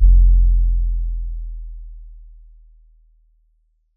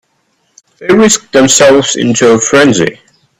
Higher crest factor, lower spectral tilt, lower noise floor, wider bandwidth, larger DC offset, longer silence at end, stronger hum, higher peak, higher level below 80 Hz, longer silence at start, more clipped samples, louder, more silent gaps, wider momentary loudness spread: first, 16 dB vs 8 dB; first, -26 dB/octave vs -3.5 dB/octave; first, -62 dBFS vs -58 dBFS; second, 0.3 kHz vs over 20 kHz; neither; first, 1.8 s vs 0.45 s; neither; about the same, -2 dBFS vs 0 dBFS; first, -18 dBFS vs -44 dBFS; second, 0 s vs 0.8 s; second, under 0.1% vs 0.2%; second, -20 LUFS vs -7 LUFS; neither; first, 25 LU vs 7 LU